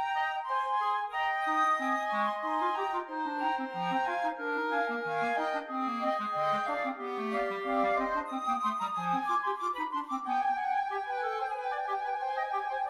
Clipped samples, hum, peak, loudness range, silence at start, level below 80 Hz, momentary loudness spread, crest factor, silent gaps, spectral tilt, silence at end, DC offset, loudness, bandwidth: under 0.1%; none; -18 dBFS; 2 LU; 0 s; -70 dBFS; 5 LU; 14 dB; none; -4.5 dB/octave; 0 s; under 0.1%; -31 LUFS; 13.5 kHz